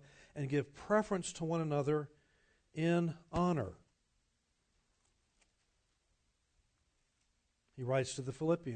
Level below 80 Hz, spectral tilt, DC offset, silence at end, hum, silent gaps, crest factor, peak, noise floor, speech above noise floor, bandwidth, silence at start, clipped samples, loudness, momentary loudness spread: -66 dBFS; -6.5 dB/octave; under 0.1%; 0 s; none; none; 20 dB; -20 dBFS; -80 dBFS; 44 dB; 9 kHz; 0.35 s; under 0.1%; -37 LUFS; 12 LU